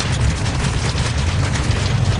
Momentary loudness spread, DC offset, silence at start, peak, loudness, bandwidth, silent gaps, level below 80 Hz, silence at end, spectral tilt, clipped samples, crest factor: 1 LU; under 0.1%; 0 s; -6 dBFS; -19 LUFS; 11 kHz; none; -24 dBFS; 0 s; -5 dB/octave; under 0.1%; 12 dB